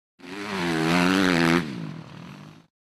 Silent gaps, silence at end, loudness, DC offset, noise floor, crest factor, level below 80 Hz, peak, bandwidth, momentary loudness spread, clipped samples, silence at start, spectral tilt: none; 0.3 s; -22 LUFS; under 0.1%; -43 dBFS; 20 dB; -56 dBFS; -6 dBFS; 15 kHz; 22 LU; under 0.1%; 0.25 s; -5 dB/octave